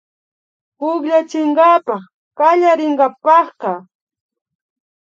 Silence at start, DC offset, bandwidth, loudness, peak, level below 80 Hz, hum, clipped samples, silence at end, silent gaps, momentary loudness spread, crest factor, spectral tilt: 0.8 s; under 0.1%; 7.6 kHz; -14 LUFS; 0 dBFS; -78 dBFS; none; under 0.1%; 1.3 s; 2.14-2.31 s; 13 LU; 16 dB; -5.5 dB/octave